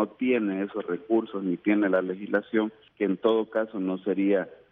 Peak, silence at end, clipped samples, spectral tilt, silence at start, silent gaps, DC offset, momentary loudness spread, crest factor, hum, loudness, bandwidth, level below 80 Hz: -10 dBFS; 0.15 s; under 0.1%; -9.5 dB/octave; 0 s; none; under 0.1%; 7 LU; 16 dB; none; -27 LUFS; 3.9 kHz; -74 dBFS